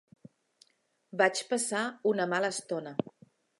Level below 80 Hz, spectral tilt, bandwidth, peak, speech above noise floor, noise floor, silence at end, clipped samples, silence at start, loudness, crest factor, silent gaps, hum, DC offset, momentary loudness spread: -80 dBFS; -3 dB/octave; 11.5 kHz; -10 dBFS; 40 dB; -70 dBFS; 0.5 s; under 0.1%; 1.15 s; -31 LUFS; 22 dB; none; none; under 0.1%; 10 LU